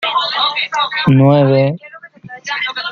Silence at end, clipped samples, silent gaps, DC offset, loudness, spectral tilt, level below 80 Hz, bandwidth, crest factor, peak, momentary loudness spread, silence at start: 0 s; under 0.1%; none; under 0.1%; -13 LUFS; -6.5 dB/octave; -52 dBFS; 7.2 kHz; 12 dB; -2 dBFS; 17 LU; 0 s